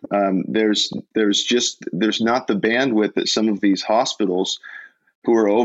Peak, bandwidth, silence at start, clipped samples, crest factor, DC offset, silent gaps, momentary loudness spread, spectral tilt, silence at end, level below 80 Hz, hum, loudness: -6 dBFS; 8.2 kHz; 0.05 s; under 0.1%; 14 dB; under 0.1%; 5.15-5.22 s; 5 LU; -3.5 dB/octave; 0 s; -66 dBFS; none; -19 LUFS